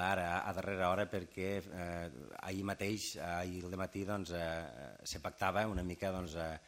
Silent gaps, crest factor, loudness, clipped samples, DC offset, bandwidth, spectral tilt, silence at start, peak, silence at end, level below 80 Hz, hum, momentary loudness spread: none; 22 dB; -40 LUFS; under 0.1%; under 0.1%; 16 kHz; -5 dB/octave; 0 s; -18 dBFS; 0 s; -58 dBFS; none; 9 LU